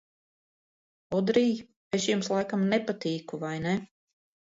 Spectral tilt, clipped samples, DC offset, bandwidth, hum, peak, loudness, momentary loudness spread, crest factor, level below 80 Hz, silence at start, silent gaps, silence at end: -5.5 dB/octave; under 0.1%; under 0.1%; 7.8 kHz; none; -10 dBFS; -29 LUFS; 8 LU; 20 dB; -68 dBFS; 1.1 s; 1.76-1.91 s; 0.65 s